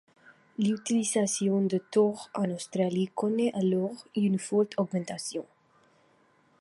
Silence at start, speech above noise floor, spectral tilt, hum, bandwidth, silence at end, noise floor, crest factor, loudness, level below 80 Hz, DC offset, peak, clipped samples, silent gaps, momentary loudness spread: 0.6 s; 37 dB; -5.5 dB/octave; none; 11.5 kHz; 1.2 s; -65 dBFS; 18 dB; -29 LUFS; -76 dBFS; under 0.1%; -12 dBFS; under 0.1%; none; 7 LU